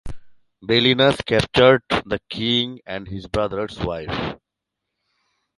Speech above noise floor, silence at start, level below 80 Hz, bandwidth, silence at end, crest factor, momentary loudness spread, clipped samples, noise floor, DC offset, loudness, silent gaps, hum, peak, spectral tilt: 62 dB; 0.05 s; -44 dBFS; 11.5 kHz; 1.25 s; 20 dB; 16 LU; under 0.1%; -82 dBFS; under 0.1%; -19 LUFS; none; none; -2 dBFS; -5.5 dB/octave